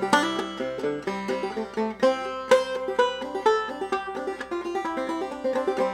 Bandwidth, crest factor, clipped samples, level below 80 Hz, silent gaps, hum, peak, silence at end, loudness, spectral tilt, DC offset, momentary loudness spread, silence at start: 14.5 kHz; 20 dB; under 0.1%; -60 dBFS; none; none; -6 dBFS; 0 s; -26 LUFS; -4 dB/octave; under 0.1%; 8 LU; 0 s